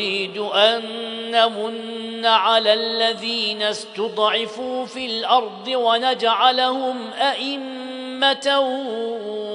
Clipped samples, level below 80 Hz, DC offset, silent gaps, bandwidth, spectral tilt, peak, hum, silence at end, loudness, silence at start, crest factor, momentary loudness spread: under 0.1%; -74 dBFS; under 0.1%; none; 10.5 kHz; -2.5 dB/octave; -2 dBFS; none; 0 s; -20 LUFS; 0 s; 20 dB; 11 LU